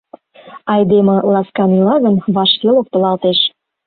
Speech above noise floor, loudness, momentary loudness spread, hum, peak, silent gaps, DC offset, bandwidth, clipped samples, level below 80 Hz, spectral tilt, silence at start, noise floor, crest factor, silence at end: 27 dB; -13 LUFS; 4 LU; none; -2 dBFS; none; under 0.1%; 4.6 kHz; under 0.1%; -56 dBFS; -11.5 dB/octave; 0.45 s; -39 dBFS; 12 dB; 0.4 s